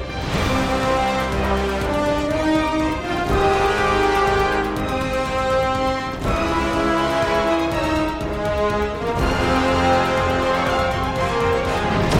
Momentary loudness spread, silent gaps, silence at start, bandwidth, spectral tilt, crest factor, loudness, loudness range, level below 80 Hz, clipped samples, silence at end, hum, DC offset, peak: 5 LU; none; 0 s; 16.5 kHz; -5.5 dB/octave; 14 dB; -20 LUFS; 1 LU; -30 dBFS; under 0.1%; 0 s; none; under 0.1%; -4 dBFS